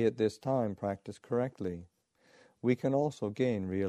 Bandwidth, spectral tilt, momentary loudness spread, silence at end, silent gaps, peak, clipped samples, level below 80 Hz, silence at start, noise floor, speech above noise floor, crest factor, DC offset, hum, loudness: 12.5 kHz; -7.5 dB/octave; 10 LU; 0 s; none; -16 dBFS; under 0.1%; -68 dBFS; 0 s; -65 dBFS; 33 dB; 18 dB; under 0.1%; none; -33 LUFS